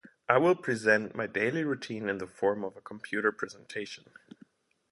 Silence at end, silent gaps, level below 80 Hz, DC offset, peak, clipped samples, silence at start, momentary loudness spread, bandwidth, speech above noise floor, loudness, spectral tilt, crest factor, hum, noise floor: 0.95 s; none; -72 dBFS; under 0.1%; -6 dBFS; under 0.1%; 0.3 s; 14 LU; 11.5 kHz; 31 dB; -30 LUFS; -5.5 dB/octave; 24 dB; none; -61 dBFS